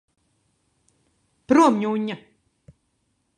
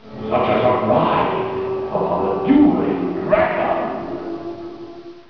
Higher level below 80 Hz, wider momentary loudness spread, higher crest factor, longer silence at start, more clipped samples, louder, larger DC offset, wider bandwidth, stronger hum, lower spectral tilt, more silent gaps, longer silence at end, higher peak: second, -66 dBFS vs -46 dBFS; about the same, 15 LU vs 15 LU; first, 22 dB vs 16 dB; first, 1.5 s vs 0.05 s; neither; about the same, -20 LUFS vs -18 LUFS; second, under 0.1% vs 0.3%; first, 11 kHz vs 5.4 kHz; neither; second, -5.5 dB/octave vs -9 dB/octave; neither; first, 1.2 s vs 0.1 s; about the same, -4 dBFS vs -2 dBFS